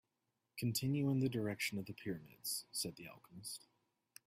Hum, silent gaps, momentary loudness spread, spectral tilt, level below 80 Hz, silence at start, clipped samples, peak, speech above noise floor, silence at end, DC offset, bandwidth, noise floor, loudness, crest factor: none; none; 15 LU; -4.5 dB/octave; -76 dBFS; 0.55 s; under 0.1%; -26 dBFS; 46 dB; 0.7 s; under 0.1%; 16 kHz; -87 dBFS; -41 LUFS; 16 dB